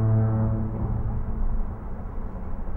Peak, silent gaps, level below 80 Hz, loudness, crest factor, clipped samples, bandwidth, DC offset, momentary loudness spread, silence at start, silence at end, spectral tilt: -12 dBFS; none; -30 dBFS; -29 LUFS; 12 dB; under 0.1%; 2.4 kHz; under 0.1%; 14 LU; 0 s; 0 s; -12.5 dB/octave